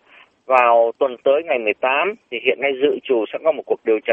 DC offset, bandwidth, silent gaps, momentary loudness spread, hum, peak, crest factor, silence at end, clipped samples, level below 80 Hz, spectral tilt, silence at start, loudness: under 0.1%; 3.8 kHz; none; 6 LU; none; 0 dBFS; 18 dB; 0 s; under 0.1%; -70 dBFS; -5.5 dB/octave; 0.5 s; -18 LUFS